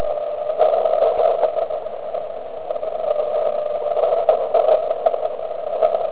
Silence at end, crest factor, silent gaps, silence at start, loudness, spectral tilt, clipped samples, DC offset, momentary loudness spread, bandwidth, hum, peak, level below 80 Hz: 0 s; 18 dB; none; 0 s; -20 LUFS; -7.5 dB/octave; under 0.1%; 1%; 11 LU; 4 kHz; none; -2 dBFS; -58 dBFS